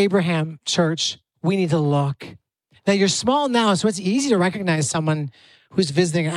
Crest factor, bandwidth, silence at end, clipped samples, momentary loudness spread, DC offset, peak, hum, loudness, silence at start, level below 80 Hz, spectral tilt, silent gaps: 16 dB; 12.5 kHz; 0 s; under 0.1%; 8 LU; under 0.1%; -4 dBFS; none; -20 LUFS; 0 s; -62 dBFS; -5 dB/octave; none